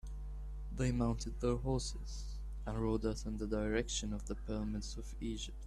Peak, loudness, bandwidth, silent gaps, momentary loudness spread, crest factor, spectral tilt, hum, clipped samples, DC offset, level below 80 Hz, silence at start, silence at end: -22 dBFS; -40 LUFS; 12 kHz; none; 11 LU; 18 dB; -5.5 dB/octave; none; under 0.1%; under 0.1%; -44 dBFS; 0.05 s; 0 s